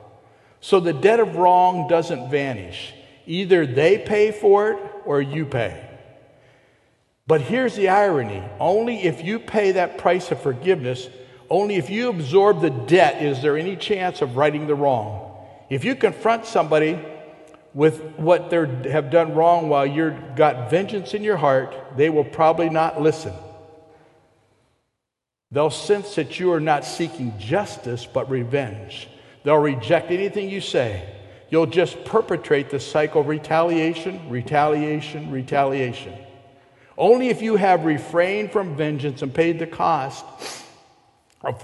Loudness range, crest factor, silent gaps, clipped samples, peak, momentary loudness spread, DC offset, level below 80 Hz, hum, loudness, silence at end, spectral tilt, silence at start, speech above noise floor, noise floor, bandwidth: 5 LU; 20 dB; none; under 0.1%; 0 dBFS; 14 LU; under 0.1%; -56 dBFS; none; -20 LUFS; 0 s; -6.5 dB/octave; 0.65 s; 64 dB; -84 dBFS; 12 kHz